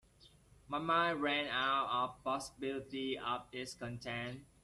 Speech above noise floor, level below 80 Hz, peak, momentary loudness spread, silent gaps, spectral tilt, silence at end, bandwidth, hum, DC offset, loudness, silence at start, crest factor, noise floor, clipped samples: 27 dB; -68 dBFS; -20 dBFS; 11 LU; none; -4 dB/octave; 0.2 s; 13 kHz; none; under 0.1%; -37 LUFS; 0.25 s; 18 dB; -65 dBFS; under 0.1%